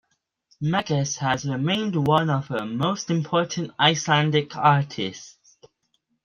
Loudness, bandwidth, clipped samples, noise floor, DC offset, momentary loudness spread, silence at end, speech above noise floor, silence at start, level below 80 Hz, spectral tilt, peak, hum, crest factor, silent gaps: -23 LUFS; 7.2 kHz; under 0.1%; -72 dBFS; under 0.1%; 9 LU; 0.95 s; 49 dB; 0.6 s; -62 dBFS; -5 dB/octave; -4 dBFS; none; 20 dB; none